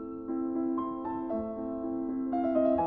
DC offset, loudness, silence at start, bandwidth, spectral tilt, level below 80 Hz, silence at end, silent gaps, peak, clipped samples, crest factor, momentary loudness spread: under 0.1%; -32 LUFS; 0 s; 3.8 kHz; -8 dB/octave; -60 dBFS; 0 s; none; -16 dBFS; under 0.1%; 16 dB; 8 LU